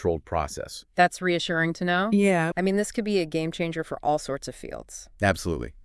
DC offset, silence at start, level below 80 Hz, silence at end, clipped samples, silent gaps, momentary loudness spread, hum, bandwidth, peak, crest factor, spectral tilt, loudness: under 0.1%; 0 s; -48 dBFS; 0.05 s; under 0.1%; none; 13 LU; none; 12 kHz; -6 dBFS; 20 dB; -5 dB/octave; -25 LUFS